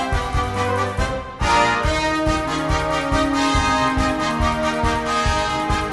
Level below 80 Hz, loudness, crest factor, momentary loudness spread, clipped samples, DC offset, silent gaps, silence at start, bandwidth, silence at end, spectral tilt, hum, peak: -28 dBFS; -20 LUFS; 16 dB; 4 LU; under 0.1%; under 0.1%; none; 0 s; 11.5 kHz; 0 s; -4.5 dB/octave; none; -4 dBFS